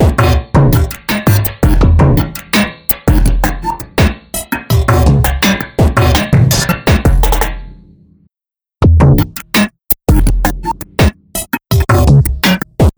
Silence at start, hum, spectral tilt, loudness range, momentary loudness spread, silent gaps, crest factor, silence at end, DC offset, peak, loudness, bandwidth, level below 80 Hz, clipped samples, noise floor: 0 s; none; -5.5 dB/octave; 2 LU; 8 LU; none; 10 dB; 0.1 s; under 0.1%; 0 dBFS; -12 LUFS; over 20 kHz; -16 dBFS; under 0.1%; -89 dBFS